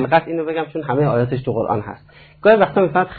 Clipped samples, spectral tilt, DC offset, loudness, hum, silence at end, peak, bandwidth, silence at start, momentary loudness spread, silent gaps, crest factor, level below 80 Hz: under 0.1%; -11 dB/octave; under 0.1%; -18 LUFS; none; 0 s; -2 dBFS; 4.7 kHz; 0 s; 10 LU; none; 16 dB; -50 dBFS